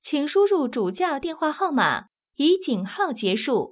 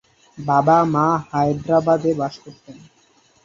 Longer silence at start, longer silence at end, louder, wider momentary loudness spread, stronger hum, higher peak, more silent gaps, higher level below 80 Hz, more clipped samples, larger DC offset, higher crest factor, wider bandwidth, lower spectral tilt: second, 0.05 s vs 0.35 s; second, 0 s vs 0.65 s; second, -23 LUFS vs -18 LUFS; second, 6 LU vs 12 LU; neither; second, -8 dBFS vs -2 dBFS; neither; second, -66 dBFS vs -56 dBFS; neither; neither; about the same, 16 dB vs 18 dB; second, 4 kHz vs 7.4 kHz; first, -9.5 dB/octave vs -8 dB/octave